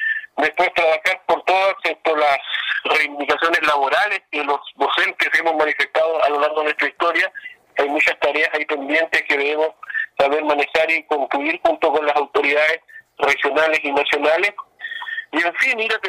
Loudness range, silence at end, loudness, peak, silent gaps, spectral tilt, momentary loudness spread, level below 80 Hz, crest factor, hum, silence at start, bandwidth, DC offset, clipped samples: 1 LU; 0 s; -18 LUFS; -6 dBFS; none; -2 dB/octave; 6 LU; -62 dBFS; 12 dB; none; 0 s; 15.5 kHz; under 0.1%; under 0.1%